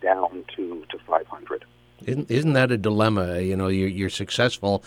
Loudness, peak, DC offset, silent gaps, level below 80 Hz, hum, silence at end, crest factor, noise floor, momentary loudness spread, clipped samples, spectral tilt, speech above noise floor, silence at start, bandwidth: -24 LUFS; -6 dBFS; under 0.1%; none; -56 dBFS; 60 Hz at -50 dBFS; 0.1 s; 18 dB; -48 dBFS; 14 LU; under 0.1%; -6 dB/octave; 25 dB; 0 s; 16 kHz